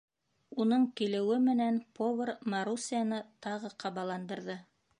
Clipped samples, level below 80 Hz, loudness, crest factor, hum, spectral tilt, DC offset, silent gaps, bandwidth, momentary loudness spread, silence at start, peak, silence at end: under 0.1%; -82 dBFS; -33 LUFS; 14 dB; none; -5 dB/octave; under 0.1%; none; 10.5 kHz; 12 LU; 0.5 s; -20 dBFS; 0.4 s